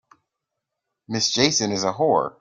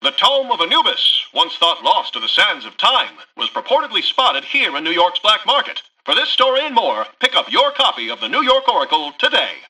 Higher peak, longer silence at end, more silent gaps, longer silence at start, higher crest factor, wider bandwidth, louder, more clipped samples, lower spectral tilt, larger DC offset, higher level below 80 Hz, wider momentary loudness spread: about the same, -4 dBFS vs -2 dBFS; about the same, 0.1 s vs 0.1 s; neither; first, 1.1 s vs 0 s; about the same, 20 dB vs 16 dB; about the same, 11 kHz vs 12 kHz; second, -21 LUFS vs -15 LUFS; neither; first, -3 dB/octave vs -1 dB/octave; neither; about the same, -60 dBFS vs -64 dBFS; about the same, 5 LU vs 5 LU